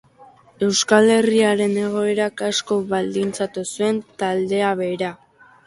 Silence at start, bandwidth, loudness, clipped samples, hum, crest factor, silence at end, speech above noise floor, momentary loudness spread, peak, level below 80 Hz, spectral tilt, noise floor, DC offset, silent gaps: 0.2 s; 11.5 kHz; -20 LUFS; under 0.1%; none; 18 dB; 0.5 s; 30 dB; 9 LU; -2 dBFS; -62 dBFS; -4 dB/octave; -49 dBFS; under 0.1%; none